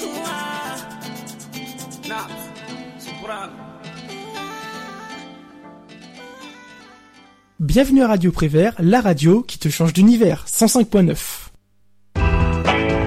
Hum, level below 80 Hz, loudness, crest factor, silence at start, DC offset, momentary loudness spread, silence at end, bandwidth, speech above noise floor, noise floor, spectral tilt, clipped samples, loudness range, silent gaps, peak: none; -32 dBFS; -17 LUFS; 16 dB; 0 s; under 0.1%; 21 LU; 0 s; 16 kHz; 44 dB; -59 dBFS; -5.5 dB/octave; under 0.1%; 19 LU; none; -4 dBFS